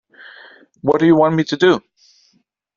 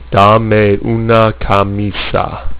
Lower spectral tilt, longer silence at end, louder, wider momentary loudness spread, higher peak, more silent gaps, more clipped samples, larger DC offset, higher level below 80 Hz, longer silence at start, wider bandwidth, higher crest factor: second, -5 dB/octave vs -10.5 dB/octave; first, 1 s vs 0 s; second, -15 LUFS vs -11 LUFS; about the same, 8 LU vs 8 LU; about the same, -2 dBFS vs 0 dBFS; neither; neither; neither; second, -58 dBFS vs -28 dBFS; first, 0.85 s vs 0 s; first, 7.2 kHz vs 4 kHz; first, 16 dB vs 10 dB